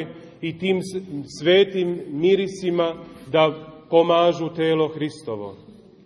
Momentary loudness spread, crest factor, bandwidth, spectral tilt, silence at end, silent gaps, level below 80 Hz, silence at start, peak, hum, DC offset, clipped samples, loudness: 15 LU; 18 dB; 11.5 kHz; -6 dB/octave; 0.3 s; none; -62 dBFS; 0 s; -4 dBFS; none; under 0.1%; under 0.1%; -21 LUFS